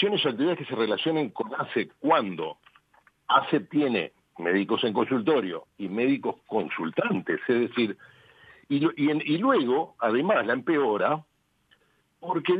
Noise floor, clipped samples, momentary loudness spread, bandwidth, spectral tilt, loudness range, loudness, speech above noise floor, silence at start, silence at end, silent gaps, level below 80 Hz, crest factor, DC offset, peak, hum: -66 dBFS; under 0.1%; 9 LU; 4.9 kHz; -8 dB/octave; 3 LU; -26 LUFS; 40 dB; 0 s; 0 s; none; -76 dBFS; 20 dB; under 0.1%; -6 dBFS; none